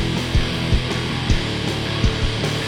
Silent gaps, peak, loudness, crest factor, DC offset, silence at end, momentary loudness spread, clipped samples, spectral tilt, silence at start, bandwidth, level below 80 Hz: none; -4 dBFS; -21 LUFS; 16 dB; under 0.1%; 0 s; 2 LU; under 0.1%; -5 dB/octave; 0 s; 16 kHz; -26 dBFS